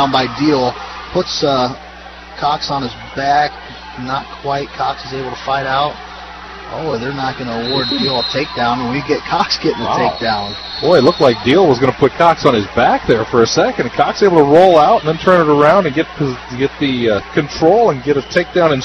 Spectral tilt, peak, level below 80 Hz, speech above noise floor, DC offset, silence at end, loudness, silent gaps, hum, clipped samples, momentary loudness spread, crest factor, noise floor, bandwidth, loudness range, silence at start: -5.5 dB/octave; 0 dBFS; -40 dBFS; 20 dB; under 0.1%; 0 s; -14 LUFS; none; none; under 0.1%; 13 LU; 14 dB; -33 dBFS; 9 kHz; 8 LU; 0 s